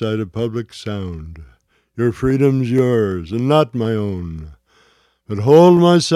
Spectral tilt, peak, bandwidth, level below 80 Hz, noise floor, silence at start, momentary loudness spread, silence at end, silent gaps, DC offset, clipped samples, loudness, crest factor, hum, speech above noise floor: -7 dB/octave; 0 dBFS; 13.5 kHz; -40 dBFS; -56 dBFS; 0 s; 20 LU; 0 s; none; under 0.1%; under 0.1%; -16 LUFS; 16 dB; none; 41 dB